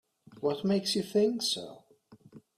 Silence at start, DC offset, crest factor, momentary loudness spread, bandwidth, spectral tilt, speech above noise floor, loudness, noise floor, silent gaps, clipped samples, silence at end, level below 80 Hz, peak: 0.3 s; under 0.1%; 16 dB; 8 LU; 15.5 kHz; -4.5 dB/octave; 29 dB; -30 LUFS; -59 dBFS; none; under 0.1%; 0.2 s; -74 dBFS; -16 dBFS